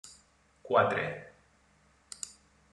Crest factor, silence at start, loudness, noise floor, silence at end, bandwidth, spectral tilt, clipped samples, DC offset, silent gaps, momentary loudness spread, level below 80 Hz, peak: 24 dB; 0.05 s; -31 LUFS; -66 dBFS; 0.45 s; 12 kHz; -4 dB/octave; under 0.1%; under 0.1%; none; 22 LU; -70 dBFS; -12 dBFS